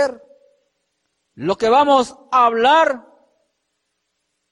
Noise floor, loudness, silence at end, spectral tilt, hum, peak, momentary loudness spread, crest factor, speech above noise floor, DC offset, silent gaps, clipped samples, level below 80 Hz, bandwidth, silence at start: -73 dBFS; -16 LUFS; 1.55 s; -4 dB/octave; none; -4 dBFS; 11 LU; 16 dB; 58 dB; under 0.1%; none; under 0.1%; -60 dBFS; 11 kHz; 0 s